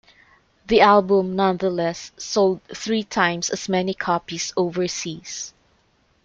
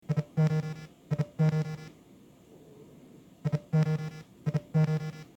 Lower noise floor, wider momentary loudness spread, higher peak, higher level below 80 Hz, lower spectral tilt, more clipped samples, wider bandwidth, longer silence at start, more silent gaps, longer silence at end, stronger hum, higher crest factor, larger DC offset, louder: first, -62 dBFS vs -56 dBFS; about the same, 15 LU vs 13 LU; first, -2 dBFS vs -14 dBFS; first, -54 dBFS vs -62 dBFS; second, -4 dB/octave vs -8.5 dB/octave; neither; about the same, 7.8 kHz vs 8 kHz; first, 0.7 s vs 0.1 s; neither; first, 0.75 s vs 0.1 s; neither; about the same, 20 dB vs 18 dB; neither; first, -21 LUFS vs -31 LUFS